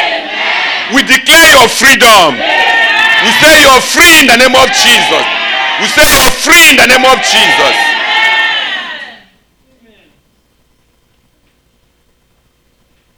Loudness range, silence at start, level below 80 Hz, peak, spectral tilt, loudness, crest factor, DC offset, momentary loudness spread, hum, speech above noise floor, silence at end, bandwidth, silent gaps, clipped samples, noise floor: 9 LU; 0 s; -32 dBFS; 0 dBFS; -0.5 dB/octave; -4 LUFS; 8 dB; under 0.1%; 9 LU; none; 48 dB; 4.05 s; over 20 kHz; none; 1%; -53 dBFS